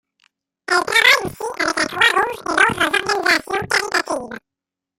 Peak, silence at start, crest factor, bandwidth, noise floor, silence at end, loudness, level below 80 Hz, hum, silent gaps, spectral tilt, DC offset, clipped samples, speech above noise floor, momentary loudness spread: 0 dBFS; 0.7 s; 20 dB; 16 kHz; -63 dBFS; 0.6 s; -17 LUFS; -54 dBFS; none; none; -2 dB/octave; under 0.1%; under 0.1%; 44 dB; 14 LU